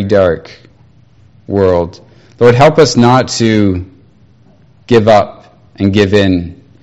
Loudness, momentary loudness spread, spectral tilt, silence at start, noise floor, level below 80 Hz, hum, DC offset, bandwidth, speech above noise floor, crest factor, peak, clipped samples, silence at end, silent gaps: -10 LUFS; 13 LU; -6 dB/octave; 0 s; -45 dBFS; -40 dBFS; none; under 0.1%; 8.8 kHz; 36 dB; 12 dB; 0 dBFS; 1%; 0.3 s; none